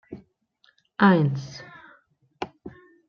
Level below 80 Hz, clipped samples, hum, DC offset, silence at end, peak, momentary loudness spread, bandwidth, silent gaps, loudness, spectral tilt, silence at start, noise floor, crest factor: -66 dBFS; under 0.1%; none; under 0.1%; 0.4 s; -6 dBFS; 27 LU; 6.8 kHz; none; -21 LUFS; -7.5 dB/octave; 0.1 s; -65 dBFS; 20 dB